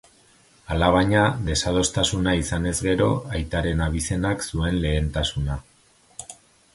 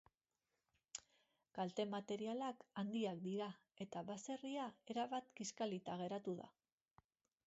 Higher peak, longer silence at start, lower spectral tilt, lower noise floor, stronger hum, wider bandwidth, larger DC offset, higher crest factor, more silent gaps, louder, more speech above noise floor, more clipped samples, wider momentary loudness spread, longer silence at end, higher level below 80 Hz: first, -4 dBFS vs -30 dBFS; second, 0.7 s vs 0.95 s; about the same, -4.5 dB/octave vs -5 dB/octave; second, -56 dBFS vs under -90 dBFS; neither; first, 11.5 kHz vs 7.6 kHz; neither; about the same, 20 dB vs 18 dB; neither; first, -23 LUFS vs -47 LUFS; second, 34 dB vs over 44 dB; neither; about the same, 12 LU vs 11 LU; second, 0.4 s vs 0.95 s; first, -34 dBFS vs -88 dBFS